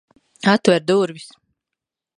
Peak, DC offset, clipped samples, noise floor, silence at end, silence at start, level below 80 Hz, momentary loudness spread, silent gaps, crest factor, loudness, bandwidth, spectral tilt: 0 dBFS; under 0.1%; under 0.1%; -84 dBFS; 0.95 s; 0.45 s; -66 dBFS; 10 LU; none; 20 dB; -18 LUFS; 11 kHz; -5.5 dB/octave